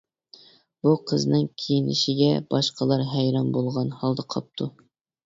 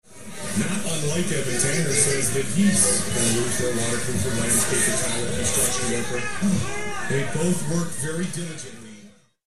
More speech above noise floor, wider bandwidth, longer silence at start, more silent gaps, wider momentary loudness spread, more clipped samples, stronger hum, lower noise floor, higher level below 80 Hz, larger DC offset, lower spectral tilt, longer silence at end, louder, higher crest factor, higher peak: about the same, 29 dB vs 26 dB; second, 7.8 kHz vs 13 kHz; first, 0.85 s vs 0 s; neither; about the same, 8 LU vs 10 LU; neither; neither; first, -53 dBFS vs -49 dBFS; second, -62 dBFS vs -46 dBFS; second, under 0.1% vs 4%; first, -6.5 dB/octave vs -3.5 dB/octave; first, 0.55 s vs 0 s; about the same, -24 LUFS vs -22 LUFS; about the same, 18 dB vs 18 dB; about the same, -8 dBFS vs -6 dBFS